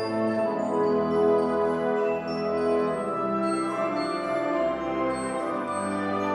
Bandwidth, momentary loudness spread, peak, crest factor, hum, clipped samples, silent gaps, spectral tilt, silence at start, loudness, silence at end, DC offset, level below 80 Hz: 11 kHz; 5 LU; -12 dBFS; 14 dB; none; under 0.1%; none; -6 dB/octave; 0 s; -26 LUFS; 0 s; under 0.1%; -58 dBFS